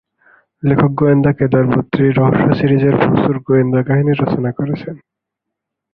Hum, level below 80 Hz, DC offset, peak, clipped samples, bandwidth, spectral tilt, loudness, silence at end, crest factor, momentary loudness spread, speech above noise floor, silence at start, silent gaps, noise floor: none; -44 dBFS; under 0.1%; 0 dBFS; under 0.1%; 5 kHz; -11.5 dB/octave; -14 LUFS; 0.95 s; 14 dB; 8 LU; 66 dB; 0.65 s; none; -79 dBFS